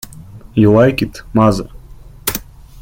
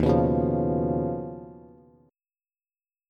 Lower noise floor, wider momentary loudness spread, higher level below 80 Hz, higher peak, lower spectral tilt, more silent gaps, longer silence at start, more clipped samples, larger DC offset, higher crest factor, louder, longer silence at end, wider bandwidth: second, -36 dBFS vs under -90 dBFS; second, 16 LU vs 19 LU; first, -36 dBFS vs -42 dBFS; first, 0 dBFS vs -10 dBFS; second, -6.5 dB/octave vs -10.5 dB/octave; neither; first, 0.3 s vs 0 s; neither; neither; about the same, 16 dB vs 18 dB; first, -14 LUFS vs -25 LUFS; second, 0 s vs 1.5 s; first, 17 kHz vs 6.6 kHz